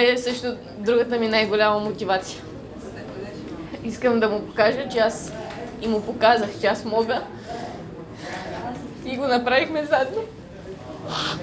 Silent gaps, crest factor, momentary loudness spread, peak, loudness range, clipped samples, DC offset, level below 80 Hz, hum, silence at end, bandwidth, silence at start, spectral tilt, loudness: none; 18 dB; 17 LU; -4 dBFS; 3 LU; under 0.1%; under 0.1%; -50 dBFS; none; 0 s; 8 kHz; 0 s; -4.5 dB/octave; -23 LUFS